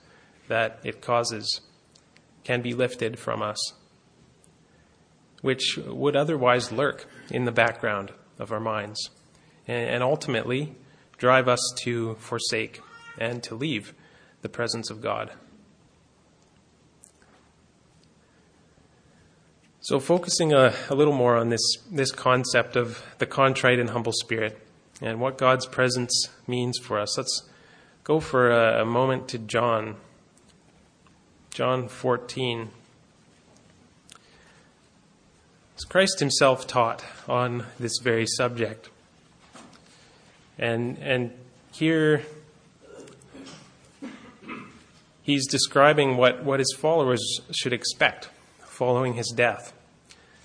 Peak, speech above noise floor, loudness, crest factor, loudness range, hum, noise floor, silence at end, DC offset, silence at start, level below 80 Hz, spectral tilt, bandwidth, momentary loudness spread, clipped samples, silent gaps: -2 dBFS; 35 dB; -25 LUFS; 24 dB; 10 LU; none; -60 dBFS; 0.75 s; under 0.1%; 0.5 s; -64 dBFS; -4 dB/octave; 10.5 kHz; 17 LU; under 0.1%; none